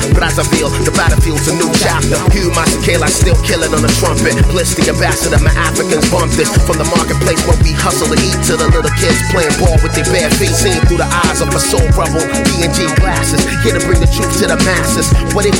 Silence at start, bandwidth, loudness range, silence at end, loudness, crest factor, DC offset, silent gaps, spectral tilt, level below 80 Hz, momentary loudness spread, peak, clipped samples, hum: 0 s; 17 kHz; 1 LU; 0 s; -11 LUFS; 10 dB; under 0.1%; none; -4.5 dB/octave; -18 dBFS; 2 LU; 0 dBFS; under 0.1%; none